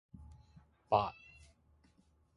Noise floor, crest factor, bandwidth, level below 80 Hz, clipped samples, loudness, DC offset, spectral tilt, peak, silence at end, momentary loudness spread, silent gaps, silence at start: -71 dBFS; 26 dB; 11 kHz; -62 dBFS; under 0.1%; -35 LUFS; under 0.1%; -6.5 dB/octave; -16 dBFS; 1.25 s; 25 LU; none; 0.2 s